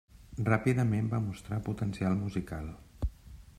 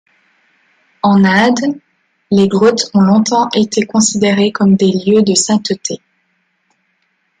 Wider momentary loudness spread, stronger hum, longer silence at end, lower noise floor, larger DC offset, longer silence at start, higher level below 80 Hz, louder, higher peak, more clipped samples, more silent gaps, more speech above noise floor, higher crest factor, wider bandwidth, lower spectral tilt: first, 13 LU vs 9 LU; neither; second, 0.05 s vs 1.45 s; second, -51 dBFS vs -62 dBFS; neither; second, 0.15 s vs 1.05 s; first, -48 dBFS vs -54 dBFS; second, -33 LUFS vs -12 LUFS; second, -12 dBFS vs 0 dBFS; neither; neither; second, 20 dB vs 51 dB; first, 20 dB vs 14 dB; first, 13.5 kHz vs 9.4 kHz; first, -8 dB/octave vs -4.5 dB/octave